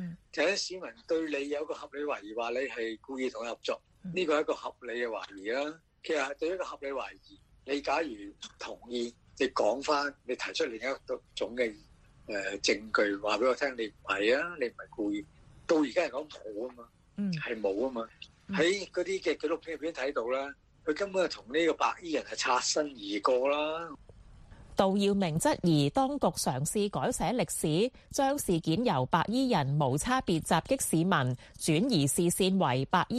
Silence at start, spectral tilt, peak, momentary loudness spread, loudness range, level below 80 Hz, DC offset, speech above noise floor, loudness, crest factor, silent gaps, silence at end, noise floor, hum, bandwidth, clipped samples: 0 s; -4.5 dB/octave; -10 dBFS; 12 LU; 6 LU; -58 dBFS; under 0.1%; 22 dB; -31 LUFS; 22 dB; none; 0 s; -53 dBFS; none; 13.5 kHz; under 0.1%